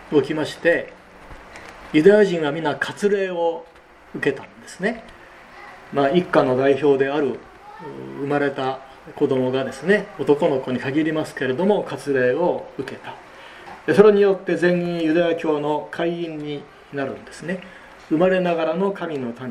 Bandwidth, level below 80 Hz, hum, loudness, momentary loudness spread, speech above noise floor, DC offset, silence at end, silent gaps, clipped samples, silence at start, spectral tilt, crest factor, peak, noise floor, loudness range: 11 kHz; -56 dBFS; none; -20 LUFS; 19 LU; 23 dB; under 0.1%; 0 s; none; under 0.1%; 0 s; -6.5 dB/octave; 20 dB; 0 dBFS; -43 dBFS; 5 LU